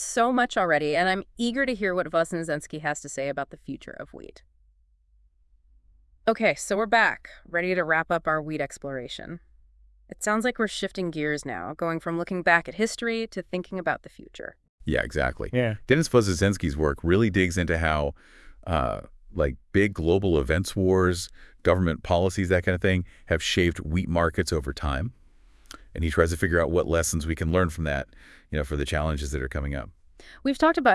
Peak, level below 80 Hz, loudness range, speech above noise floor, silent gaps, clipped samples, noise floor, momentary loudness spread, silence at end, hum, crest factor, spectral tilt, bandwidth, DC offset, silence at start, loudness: -4 dBFS; -42 dBFS; 6 LU; 37 dB; 14.69-14.78 s; under 0.1%; -62 dBFS; 13 LU; 0 s; none; 22 dB; -5 dB/octave; 12 kHz; under 0.1%; 0 s; -26 LUFS